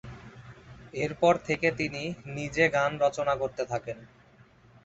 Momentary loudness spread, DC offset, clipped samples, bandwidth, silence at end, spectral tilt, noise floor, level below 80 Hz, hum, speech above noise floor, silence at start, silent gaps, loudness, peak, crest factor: 22 LU; under 0.1%; under 0.1%; 8 kHz; 0.8 s; -5 dB/octave; -57 dBFS; -58 dBFS; none; 29 dB; 0.05 s; none; -28 LUFS; -8 dBFS; 22 dB